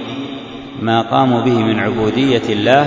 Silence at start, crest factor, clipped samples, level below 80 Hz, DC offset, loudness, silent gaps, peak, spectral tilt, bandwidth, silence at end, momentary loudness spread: 0 s; 14 dB; under 0.1%; -48 dBFS; under 0.1%; -15 LUFS; none; 0 dBFS; -6.5 dB/octave; 7.8 kHz; 0 s; 13 LU